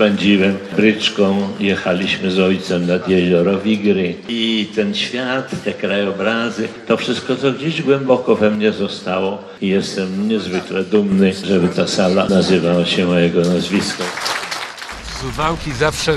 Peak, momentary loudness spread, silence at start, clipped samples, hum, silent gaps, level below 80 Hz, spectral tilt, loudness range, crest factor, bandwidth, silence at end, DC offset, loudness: 0 dBFS; 7 LU; 0 s; under 0.1%; none; none; -44 dBFS; -5.5 dB/octave; 3 LU; 16 dB; 12.5 kHz; 0 s; under 0.1%; -17 LUFS